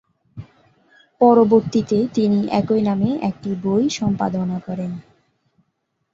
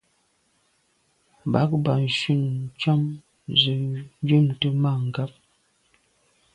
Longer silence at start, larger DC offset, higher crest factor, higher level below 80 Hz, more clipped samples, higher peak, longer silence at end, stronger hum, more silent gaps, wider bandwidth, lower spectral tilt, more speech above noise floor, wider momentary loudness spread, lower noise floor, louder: second, 0.35 s vs 1.45 s; neither; about the same, 18 dB vs 22 dB; about the same, -56 dBFS vs -60 dBFS; neither; about the same, -2 dBFS vs -4 dBFS; second, 1.1 s vs 1.25 s; neither; neither; second, 7.8 kHz vs 9.6 kHz; about the same, -7 dB/octave vs -7 dB/octave; first, 54 dB vs 45 dB; about the same, 12 LU vs 11 LU; first, -72 dBFS vs -67 dBFS; first, -19 LUFS vs -23 LUFS